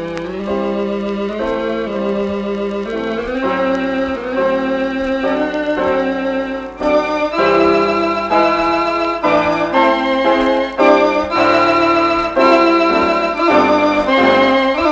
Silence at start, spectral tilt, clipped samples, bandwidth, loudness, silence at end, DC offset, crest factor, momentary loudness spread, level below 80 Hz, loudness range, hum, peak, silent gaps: 0 s; -5.5 dB/octave; under 0.1%; 8 kHz; -15 LUFS; 0 s; under 0.1%; 14 dB; 8 LU; -42 dBFS; 6 LU; none; 0 dBFS; none